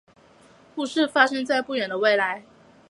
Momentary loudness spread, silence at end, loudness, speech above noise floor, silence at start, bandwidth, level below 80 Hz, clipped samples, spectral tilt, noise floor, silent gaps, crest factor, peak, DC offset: 13 LU; 0.5 s; -23 LUFS; 31 dB; 0.75 s; 11.5 kHz; -72 dBFS; under 0.1%; -3.5 dB/octave; -54 dBFS; none; 22 dB; -2 dBFS; under 0.1%